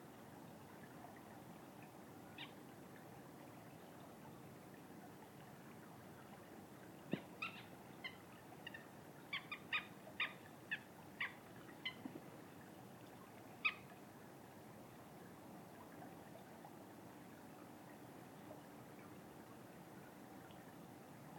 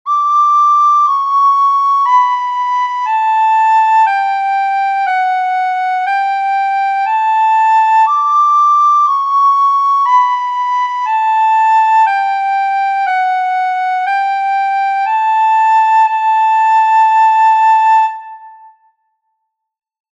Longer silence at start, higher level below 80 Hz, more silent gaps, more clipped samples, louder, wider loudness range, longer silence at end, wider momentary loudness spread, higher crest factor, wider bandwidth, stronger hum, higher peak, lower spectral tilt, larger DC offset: about the same, 0 s vs 0.05 s; about the same, -84 dBFS vs -86 dBFS; neither; neither; second, -53 LUFS vs -11 LUFS; first, 10 LU vs 3 LU; second, 0 s vs 1.65 s; first, 14 LU vs 6 LU; first, 28 dB vs 10 dB; first, 17.5 kHz vs 7.6 kHz; neither; second, -26 dBFS vs -2 dBFS; first, -4 dB/octave vs 4.5 dB/octave; neither